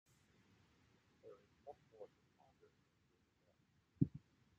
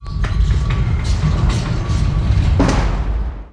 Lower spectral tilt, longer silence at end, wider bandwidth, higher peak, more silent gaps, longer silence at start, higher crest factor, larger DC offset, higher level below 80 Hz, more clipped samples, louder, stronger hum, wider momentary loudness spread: first, -10.5 dB/octave vs -6.5 dB/octave; first, 0.4 s vs 0.05 s; second, 8 kHz vs 10 kHz; second, -20 dBFS vs -2 dBFS; neither; first, 1.25 s vs 0 s; first, 32 dB vs 14 dB; neither; second, -76 dBFS vs -18 dBFS; neither; second, -43 LUFS vs -18 LUFS; neither; first, 21 LU vs 6 LU